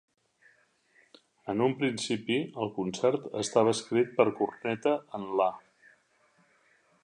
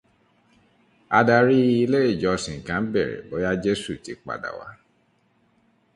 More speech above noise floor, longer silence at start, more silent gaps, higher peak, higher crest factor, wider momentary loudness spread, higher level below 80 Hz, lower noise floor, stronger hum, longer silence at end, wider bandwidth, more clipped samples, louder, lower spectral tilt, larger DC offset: second, 39 dB vs 43 dB; first, 1.45 s vs 1.1 s; neither; second, -8 dBFS vs -2 dBFS; about the same, 22 dB vs 22 dB; second, 7 LU vs 17 LU; second, -74 dBFS vs -52 dBFS; about the same, -67 dBFS vs -65 dBFS; neither; first, 1.45 s vs 1.2 s; about the same, 11 kHz vs 11.5 kHz; neither; second, -29 LUFS vs -22 LUFS; about the same, -5 dB/octave vs -6 dB/octave; neither